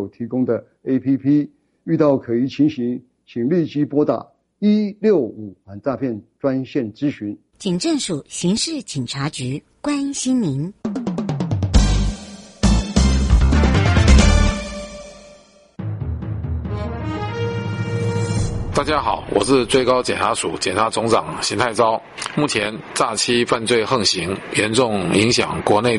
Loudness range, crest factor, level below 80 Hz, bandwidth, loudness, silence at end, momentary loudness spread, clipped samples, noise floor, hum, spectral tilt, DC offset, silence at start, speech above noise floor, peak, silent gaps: 6 LU; 18 dB; -26 dBFS; 11.5 kHz; -19 LUFS; 0 s; 11 LU; under 0.1%; -48 dBFS; none; -5 dB/octave; under 0.1%; 0 s; 29 dB; -2 dBFS; none